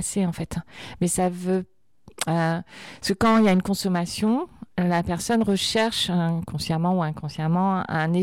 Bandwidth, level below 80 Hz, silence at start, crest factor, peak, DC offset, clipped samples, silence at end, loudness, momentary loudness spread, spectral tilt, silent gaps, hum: 16 kHz; -50 dBFS; 0 s; 14 dB; -10 dBFS; under 0.1%; under 0.1%; 0 s; -24 LUFS; 11 LU; -5 dB/octave; none; none